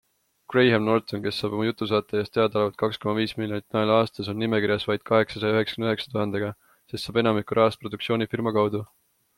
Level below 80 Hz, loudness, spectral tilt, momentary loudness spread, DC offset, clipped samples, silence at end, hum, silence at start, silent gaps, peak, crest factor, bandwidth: -62 dBFS; -25 LUFS; -6.5 dB/octave; 7 LU; under 0.1%; under 0.1%; 0.55 s; none; 0.5 s; none; -6 dBFS; 18 dB; 16.5 kHz